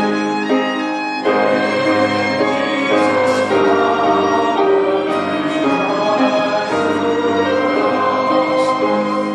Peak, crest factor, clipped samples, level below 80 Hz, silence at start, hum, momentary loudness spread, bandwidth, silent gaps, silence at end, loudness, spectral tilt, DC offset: -2 dBFS; 12 dB; under 0.1%; -62 dBFS; 0 s; none; 3 LU; 11 kHz; none; 0 s; -15 LUFS; -5 dB/octave; under 0.1%